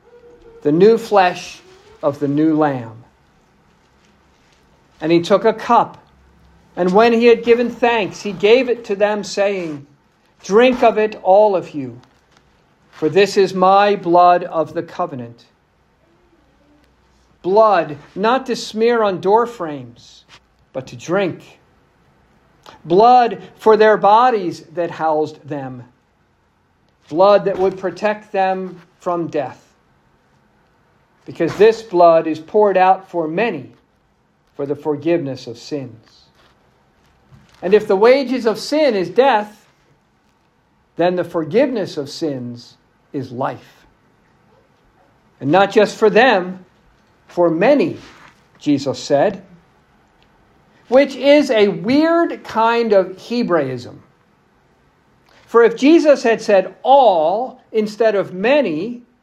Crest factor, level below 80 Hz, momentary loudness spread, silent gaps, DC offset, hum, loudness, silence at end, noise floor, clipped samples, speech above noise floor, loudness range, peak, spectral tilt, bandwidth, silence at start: 16 dB; -60 dBFS; 17 LU; none; under 0.1%; none; -15 LUFS; 0.25 s; -59 dBFS; under 0.1%; 44 dB; 8 LU; 0 dBFS; -5.5 dB/octave; 12.5 kHz; 0.65 s